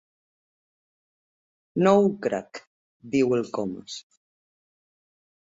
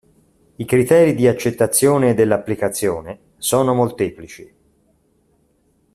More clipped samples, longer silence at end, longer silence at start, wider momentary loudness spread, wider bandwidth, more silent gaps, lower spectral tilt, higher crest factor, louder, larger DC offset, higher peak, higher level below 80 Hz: neither; about the same, 1.4 s vs 1.5 s; first, 1.75 s vs 0.6 s; first, 20 LU vs 15 LU; second, 7.8 kHz vs 14.5 kHz; first, 2.67-3.00 s vs none; first, -6.5 dB/octave vs -5 dB/octave; about the same, 22 dB vs 18 dB; second, -24 LUFS vs -17 LUFS; neither; second, -6 dBFS vs 0 dBFS; second, -68 dBFS vs -54 dBFS